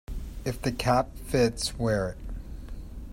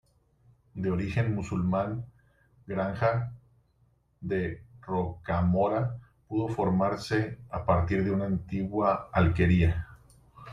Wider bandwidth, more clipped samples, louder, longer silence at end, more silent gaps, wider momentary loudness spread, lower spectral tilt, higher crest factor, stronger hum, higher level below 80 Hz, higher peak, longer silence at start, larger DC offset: first, 16 kHz vs 11 kHz; neither; about the same, -28 LUFS vs -29 LUFS; about the same, 0 s vs 0 s; neither; first, 18 LU vs 11 LU; second, -5 dB/octave vs -8.5 dB/octave; about the same, 18 dB vs 20 dB; neither; first, -38 dBFS vs -48 dBFS; about the same, -10 dBFS vs -10 dBFS; second, 0.1 s vs 0.75 s; neither